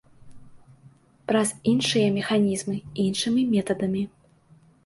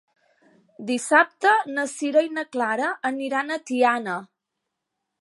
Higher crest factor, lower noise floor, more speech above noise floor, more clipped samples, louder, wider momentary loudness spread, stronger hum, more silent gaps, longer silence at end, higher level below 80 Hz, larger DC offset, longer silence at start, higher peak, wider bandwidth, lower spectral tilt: second, 16 dB vs 22 dB; second, -56 dBFS vs -82 dBFS; second, 33 dB vs 59 dB; neither; about the same, -24 LUFS vs -23 LUFS; about the same, 8 LU vs 10 LU; neither; neither; second, 0.8 s vs 0.95 s; first, -60 dBFS vs -82 dBFS; neither; second, 0.25 s vs 0.8 s; second, -10 dBFS vs -2 dBFS; about the same, 11.5 kHz vs 11.5 kHz; first, -5 dB/octave vs -3 dB/octave